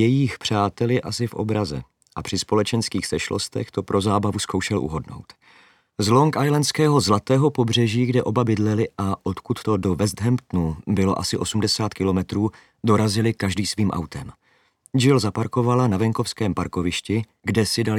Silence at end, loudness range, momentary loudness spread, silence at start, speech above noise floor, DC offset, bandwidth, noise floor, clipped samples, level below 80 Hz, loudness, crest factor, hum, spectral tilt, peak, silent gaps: 0 s; 4 LU; 9 LU; 0 s; 37 dB; under 0.1%; 16 kHz; -58 dBFS; under 0.1%; -52 dBFS; -22 LUFS; 18 dB; none; -5.5 dB/octave; -4 dBFS; none